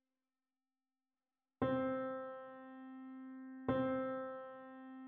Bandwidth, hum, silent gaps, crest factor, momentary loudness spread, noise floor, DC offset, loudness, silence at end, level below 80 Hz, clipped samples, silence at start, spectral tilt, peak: 4.2 kHz; none; none; 20 dB; 16 LU; under -90 dBFS; under 0.1%; -42 LUFS; 0 s; -74 dBFS; under 0.1%; 1.6 s; -6 dB/octave; -24 dBFS